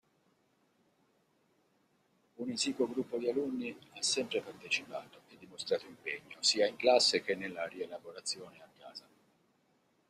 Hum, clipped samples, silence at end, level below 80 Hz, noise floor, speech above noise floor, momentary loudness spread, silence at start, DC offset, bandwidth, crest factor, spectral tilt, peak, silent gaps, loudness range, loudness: none; under 0.1%; 1.1 s; -80 dBFS; -74 dBFS; 39 dB; 18 LU; 2.4 s; under 0.1%; 14 kHz; 24 dB; -2 dB/octave; -14 dBFS; none; 6 LU; -34 LUFS